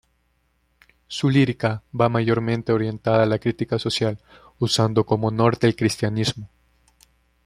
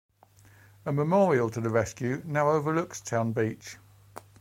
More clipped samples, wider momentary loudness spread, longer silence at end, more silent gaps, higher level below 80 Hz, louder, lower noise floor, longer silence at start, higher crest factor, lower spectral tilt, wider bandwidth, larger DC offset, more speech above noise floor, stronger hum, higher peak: neither; about the same, 7 LU vs 9 LU; first, 1 s vs 0.2 s; neither; first, -54 dBFS vs -64 dBFS; first, -21 LUFS vs -27 LUFS; first, -67 dBFS vs -57 dBFS; first, 1.1 s vs 0.85 s; about the same, 20 dB vs 18 dB; about the same, -6 dB/octave vs -6.5 dB/octave; second, 14 kHz vs 16.5 kHz; neither; first, 46 dB vs 31 dB; neither; first, -2 dBFS vs -10 dBFS